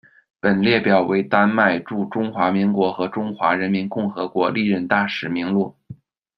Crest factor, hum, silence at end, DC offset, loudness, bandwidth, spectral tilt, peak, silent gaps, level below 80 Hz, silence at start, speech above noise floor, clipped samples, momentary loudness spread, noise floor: 18 dB; none; 0.45 s; under 0.1%; -20 LUFS; 6 kHz; -8.5 dB/octave; -2 dBFS; none; -62 dBFS; 0.45 s; 23 dB; under 0.1%; 8 LU; -42 dBFS